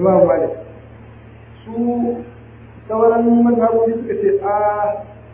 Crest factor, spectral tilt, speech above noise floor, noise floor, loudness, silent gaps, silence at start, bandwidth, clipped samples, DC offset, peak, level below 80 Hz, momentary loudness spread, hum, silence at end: 16 dB; -12.5 dB/octave; 24 dB; -39 dBFS; -16 LUFS; none; 0 s; 3.3 kHz; under 0.1%; under 0.1%; 0 dBFS; -46 dBFS; 16 LU; none; 0 s